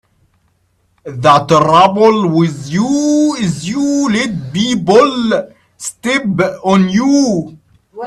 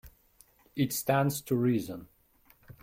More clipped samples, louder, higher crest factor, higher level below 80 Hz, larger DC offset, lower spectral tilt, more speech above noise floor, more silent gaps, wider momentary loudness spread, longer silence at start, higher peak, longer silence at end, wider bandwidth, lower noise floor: neither; first, -12 LUFS vs -29 LUFS; second, 12 dB vs 18 dB; first, -50 dBFS vs -62 dBFS; neither; about the same, -5.5 dB/octave vs -5.5 dB/octave; first, 47 dB vs 35 dB; neither; second, 9 LU vs 15 LU; first, 1.05 s vs 0.05 s; first, 0 dBFS vs -14 dBFS; about the same, 0 s vs 0.1 s; second, 13 kHz vs 16.5 kHz; second, -59 dBFS vs -64 dBFS